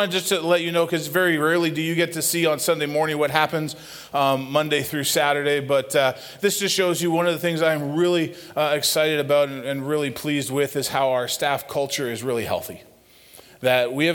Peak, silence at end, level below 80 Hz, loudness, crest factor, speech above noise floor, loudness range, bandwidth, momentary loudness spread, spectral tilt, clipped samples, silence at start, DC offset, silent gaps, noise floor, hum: -2 dBFS; 0 s; -62 dBFS; -22 LUFS; 20 dB; 28 dB; 3 LU; 19 kHz; 6 LU; -3.5 dB/octave; under 0.1%; 0 s; under 0.1%; none; -50 dBFS; none